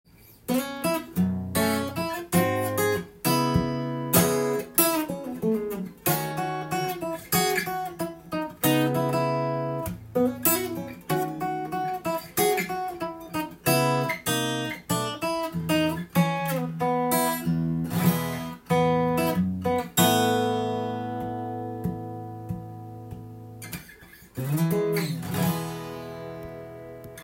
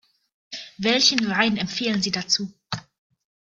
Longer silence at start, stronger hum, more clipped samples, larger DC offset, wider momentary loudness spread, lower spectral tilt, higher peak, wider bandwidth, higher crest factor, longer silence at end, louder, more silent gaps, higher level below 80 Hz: second, 0.3 s vs 0.5 s; neither; neither; neither; second, 14 LU vs 18 LU; first, -4.5 dB/octave vs -3 dB/octave; second, -6 dBFS vs -2 dBFS; first, 17 kHz vs 11 kHz; about the same, 20 dB vs 24 dB; second, 0 s vs 0.65 s; second, -26 LUFS vs -21 LUFS; neither; first, -56 dBFS vs -62 dBFS